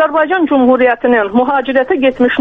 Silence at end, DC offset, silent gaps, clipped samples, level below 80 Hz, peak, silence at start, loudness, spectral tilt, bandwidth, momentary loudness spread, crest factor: 0 s; under 0.1%; none; under 0.1%; -46 dBFS; -2 dBFS; 0 s; -11 LUFS; -7 dB/octave; 3.9 kHz; 3 LU; 10 dB